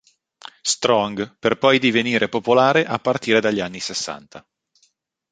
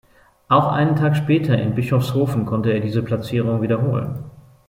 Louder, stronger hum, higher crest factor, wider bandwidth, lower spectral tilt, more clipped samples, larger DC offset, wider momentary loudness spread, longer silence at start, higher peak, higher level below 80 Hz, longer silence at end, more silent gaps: about the same, -19 LUFS vs -19 LUFS; neither; about the same, 20 dB vs 16 dB; second, 9.6 kHz vs 16 kHz; second, -3.5 dB/octave vs -8 dB/octave; neither; neither; first, 10 LU vs 5 LU; first, 0.65 s vs 0.5 s; about the same, 0 dBFS vs -2 dBFS; second, -60 dBFS vs -52 dBFS; first, 0.95 s vs 0.3 s; neither